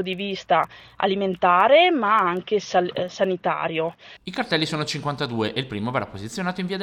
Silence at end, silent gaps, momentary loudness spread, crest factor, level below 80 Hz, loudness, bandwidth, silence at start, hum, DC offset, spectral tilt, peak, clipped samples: 0 s; none; 12 LU; 18 dB; -60 dBFS; -22 LUFS; 13.5 kHz; 0 s; none; under 0.1%; -5 dB/octave; -4 dBFS; under 0.1%